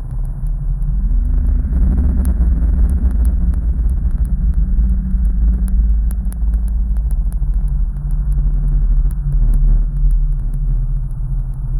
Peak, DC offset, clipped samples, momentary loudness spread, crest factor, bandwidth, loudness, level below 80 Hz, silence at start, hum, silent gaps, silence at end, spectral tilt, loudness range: -4 dBFS; under 0.1%; under 0.1%; 6 LU; 10 dB; 10.5 kHz; -19 LUFS; -14 dBFS; 0 s; none; none; 0 s; -10 dB/octave; 2 LU